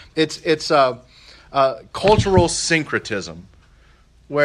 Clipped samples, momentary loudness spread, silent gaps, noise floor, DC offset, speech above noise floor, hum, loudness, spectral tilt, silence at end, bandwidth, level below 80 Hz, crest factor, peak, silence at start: under 0.1%; 12 LU; none; -52 dBFS; under 0.1%; 33 dB; none; -19 LUFS; -4.5 dB/octave; 0 s; 12.5 kHz; -42 dBFS; 20 dB; 0 dBFS; 0.15 s